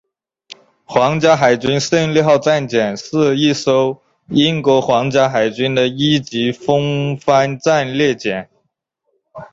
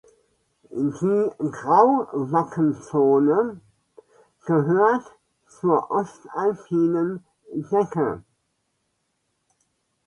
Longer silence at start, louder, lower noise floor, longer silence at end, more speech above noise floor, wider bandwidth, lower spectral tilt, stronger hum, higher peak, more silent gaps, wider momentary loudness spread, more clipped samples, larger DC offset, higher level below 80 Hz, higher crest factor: second, 0.5 s vs 0.75 s; first, -15 LUFS vs -22 LUFS; second, -69 dBFS vs -74 dBFS; second, 0.05 s vs 1.85 s; about the same, 55 dB vs 52 dB; second, 8 kHz vs 10.5 kHz; second, -5.5 dB/octave vs -9 dB/octave; neither; about the same, 0 dBFS vs -2 dBFS; neither; second, 6 LU vs 12 LU; neither; neither; first, -54 dBFS vs -66 dBFS; about the same, 16 dB vs 20 dB